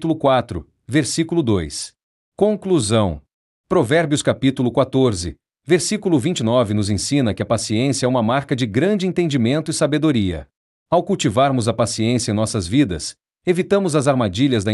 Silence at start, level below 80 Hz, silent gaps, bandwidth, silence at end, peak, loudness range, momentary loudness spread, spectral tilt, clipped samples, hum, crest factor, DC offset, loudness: 0 s; -48 dBFS; 2.03-2.32 s, 3.33-3.64 s, 10.56-10.86 s; 12 kHz; 0 s; -4 dBFS; 1 LU; 6 LU; -5.5 dB/octave; under 0.1%; none; 14 dB; under 0.1%; -19 LUFS